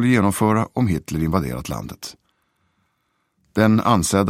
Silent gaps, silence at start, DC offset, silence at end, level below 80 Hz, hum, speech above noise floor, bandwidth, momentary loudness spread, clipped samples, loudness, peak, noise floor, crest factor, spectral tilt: none; 0 s; under 0.1%; 0 s; -42 dBFS; none; 51 dB; 16.5 kHz; 14 LU; under 0.1%; -20 LUFS; -2 dBFS; -70 dBFS; 18 dB; -6 dB/octave